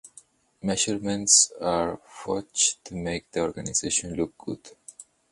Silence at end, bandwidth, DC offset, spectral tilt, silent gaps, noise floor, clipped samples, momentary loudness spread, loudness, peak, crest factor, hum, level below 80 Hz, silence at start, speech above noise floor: 0.3 s; 11.5 kHz; under 0.1%; -2 dB/octave; none; -55 dBFS; under 0.1%; 20 LU; -24 LUFS; -2 dBFS; 26 dB; none; -54 dBFS; 0.05 s; 29 dB